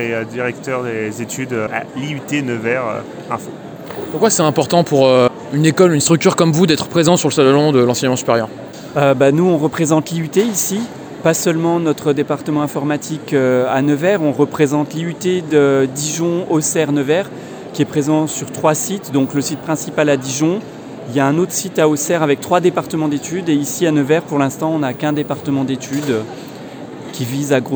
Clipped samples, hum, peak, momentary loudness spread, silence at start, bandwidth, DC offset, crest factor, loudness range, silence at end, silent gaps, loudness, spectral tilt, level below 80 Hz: under 0.1%; none; 0 dBFS; 12 LU; 0 s; over 20 kHz; under 0.1%; 16 dB; 6 LU; 0 s; none; -16 LUFS; -5 dB/octave; -58 dBFS